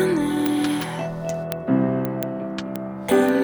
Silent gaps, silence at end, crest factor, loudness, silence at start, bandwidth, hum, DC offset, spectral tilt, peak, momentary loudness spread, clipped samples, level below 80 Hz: none; 0 s; 18 dB; -24 LUFS; 0 s; over 20 kHz; none; under 0.1%; -6 dB/octave; -4 dBFS; 9 LU; under 0.1%; -54 dBFS